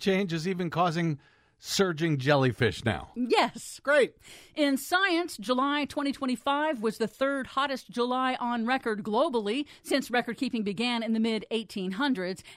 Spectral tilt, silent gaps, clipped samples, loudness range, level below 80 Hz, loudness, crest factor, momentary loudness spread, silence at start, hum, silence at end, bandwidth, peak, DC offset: -5 dB/octave; none; under 0.1%; 2 LU; -62 dBFS; -28 LUFS; 18 dB; 7 LU; 0 s; none; 0 s; 16 kHz; -10 dBFS; under 0.1%